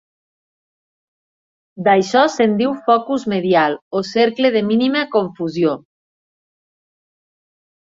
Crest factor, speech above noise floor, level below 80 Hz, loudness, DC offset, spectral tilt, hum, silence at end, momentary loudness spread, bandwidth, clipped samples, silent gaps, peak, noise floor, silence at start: 18 dB; over 74 dB; -64 dBFS; -17 LUFS; under 0.1%; -5.5 dB/octave; none; 2.15 s; 6 LU; 7.8 kHz; under 0.1%; 3.82-3.91 s; -2 dBFS; under -90 dBFS; 1.75 s